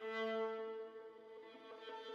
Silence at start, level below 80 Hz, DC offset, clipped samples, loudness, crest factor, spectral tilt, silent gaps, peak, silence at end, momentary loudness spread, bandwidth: 0 s; under -90 dBFS; under 0.1%; under 0.1%; -46 LUFS; 14 dB; -4.5 dB/octave; none; -32 dBFS; 0 s; 16 LU; 7.2 kHz